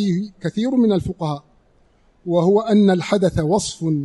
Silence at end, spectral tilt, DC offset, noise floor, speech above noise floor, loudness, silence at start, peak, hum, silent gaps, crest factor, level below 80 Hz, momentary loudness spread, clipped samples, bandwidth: 0 s; -6.5 dB/octave; under 0.1%; -56 dBFS; 38 dB; -19 LUFS; 0 s; -4 dBFS; none; none; 16 dB; -44 dBFS; 11 LU; under 0.1%; 11.5 kHz